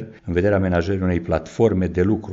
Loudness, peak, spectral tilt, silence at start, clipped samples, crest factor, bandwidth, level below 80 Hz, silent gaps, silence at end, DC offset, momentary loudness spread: -20 LUFS; -4 dBFS; -7.5 dB/octave; 0 s; under 0.1%; 16 dB; 7.6 kHz; -40 dBFS; none; 0 s; under 0.1%; 4 LU